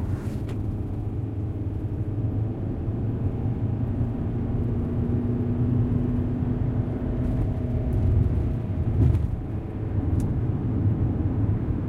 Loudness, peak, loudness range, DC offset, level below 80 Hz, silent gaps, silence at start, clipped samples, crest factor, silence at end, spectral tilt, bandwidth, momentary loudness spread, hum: -26 LUFS; -8 dBFS; 3 LU; under 0.1%; -34 dBFS; none; 0 s; under 0.1%; 16 dB; 0 s; -10.5 dB/octave; 3.9 kHz; 7 LU; none